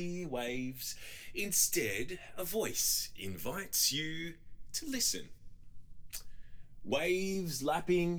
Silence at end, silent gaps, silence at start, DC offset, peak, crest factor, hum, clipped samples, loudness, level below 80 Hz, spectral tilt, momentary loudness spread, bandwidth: 0 s; none; 0 s; under 0.1%; -16 dBFS; 20 dB; none; under 0.1%; -34 LUFS; -56 dBFS; -2.5 dB/octave; 14 LU; over 20 kHz